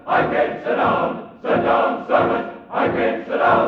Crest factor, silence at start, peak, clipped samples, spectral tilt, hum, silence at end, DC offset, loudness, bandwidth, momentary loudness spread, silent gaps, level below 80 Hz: 14 dB; 0.05 s; -4 dBFS; under 0.1%; -7.5 dB/octave; none; 0 s; under 0.1%; -19 LUFS; 6.4 kHz; 7 LU; none; -52 dBFS